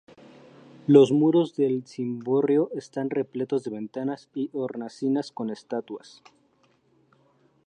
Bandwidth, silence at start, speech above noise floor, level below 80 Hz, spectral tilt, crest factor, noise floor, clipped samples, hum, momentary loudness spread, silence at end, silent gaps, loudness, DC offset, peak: 9.4 kHz; 0.9 s; 40 dB; -78 dBFS; -7.5 dB/octave; 22 dB; -65 dBFS; under 0.1%; none; 15 LU; 1.7 s; none; -25 LUFS; under 0.1%; -4 dBFS